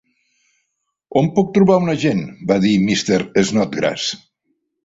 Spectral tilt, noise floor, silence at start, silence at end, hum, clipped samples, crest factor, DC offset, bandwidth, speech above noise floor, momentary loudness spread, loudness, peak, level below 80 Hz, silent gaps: -5.5 dB/octave; -74 dBFS; 1.1 s; 0.7 s; none; under 0.1%; 16 dB; under 0.1%; 7.8 kHz; 58 dB; 8 LU; -17 LUFS; -2 dBFS; -52 dBFS; none